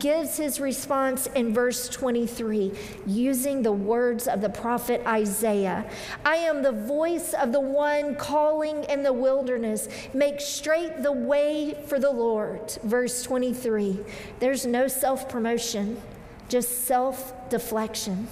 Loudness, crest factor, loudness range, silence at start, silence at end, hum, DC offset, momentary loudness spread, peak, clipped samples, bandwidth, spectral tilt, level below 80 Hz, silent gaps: -26 LUFS; 16 dB; 2 LU; 0 s; 0 s; none; under 0.1%; 6 LU; -10 dBFS; under 0.1%; 16 kHz; -4 dB/octave; -56 dBFS; none